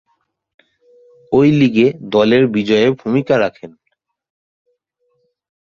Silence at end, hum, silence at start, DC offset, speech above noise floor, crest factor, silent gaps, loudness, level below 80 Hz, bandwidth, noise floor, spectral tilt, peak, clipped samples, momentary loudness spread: 2.05 s; none; 1.3 s; under 0.1%; 53 dB; 16 dB; none; -14 LUFS; -54 dBFS; 7.2 kHz; -66 dBFS; -7.5 dB/octave; -2 dBFS; under 0.1%; 5 LU